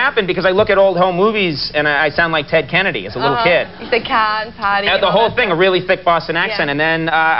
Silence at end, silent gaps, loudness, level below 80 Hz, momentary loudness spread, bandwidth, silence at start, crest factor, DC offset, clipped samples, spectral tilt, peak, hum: 0 s; none; -14 LUFS; -44 dBFS; 5 LU; 5.8 kHz; 0 s; 14 dB; 0.7%; under 0.1%; -2 dB/octave; 0 dBFS; none